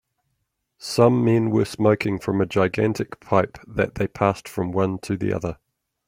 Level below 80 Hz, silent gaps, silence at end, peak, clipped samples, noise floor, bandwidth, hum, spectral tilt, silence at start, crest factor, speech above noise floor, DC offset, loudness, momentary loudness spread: -52 dBFS; none; 0.55 s; -2 dBFS; under 0.1%; -75 dBFS; 16 kHz; none; -7 dB/octave; 0.8 s; 20 dB; 54 dB; under 0.1%; -22 LUFS; 9 LU